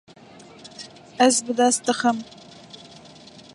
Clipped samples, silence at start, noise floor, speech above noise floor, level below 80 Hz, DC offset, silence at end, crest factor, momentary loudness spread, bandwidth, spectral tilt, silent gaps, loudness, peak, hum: under 0.1%; 0.65 s; -46 dBFS; 26 dB; -70 dBFS; under 0.1%; 1.3 s; 22 dB; 25 LU; 11.5 kHz; -2 dB/octave; none; -20 LUFS; -4 dBFS; none